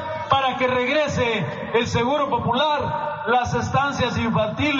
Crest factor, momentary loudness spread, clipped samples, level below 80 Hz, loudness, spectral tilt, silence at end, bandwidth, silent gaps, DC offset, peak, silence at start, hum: 16 dB; 3 LU; under 0.1%; -48 dBFS; -21 LUFS; -3.5 dB/octave; 0 s; 7.4 kHz; none; under 0.1%; -4 dBFS; 0 s; none